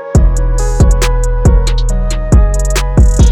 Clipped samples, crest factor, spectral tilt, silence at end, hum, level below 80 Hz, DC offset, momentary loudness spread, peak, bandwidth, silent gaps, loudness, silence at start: under 0.1%; 8 dB; -6 dB/octave; 0 s; none; -10 dBFS; under 0.1%; 5 LU; 0 dBFS; 12.5 kHz; none; -12 LUFS; 0 s